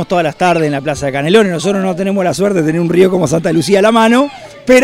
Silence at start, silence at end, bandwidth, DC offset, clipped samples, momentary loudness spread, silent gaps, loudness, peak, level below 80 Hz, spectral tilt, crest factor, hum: 0 s; 0 s; 16 kHz; under 0.1%; 0.2%; 6 LU; none; -12 LUFS; 0 dBFS; -44 dBFS; -5.5 dB/octave; 12 dB; none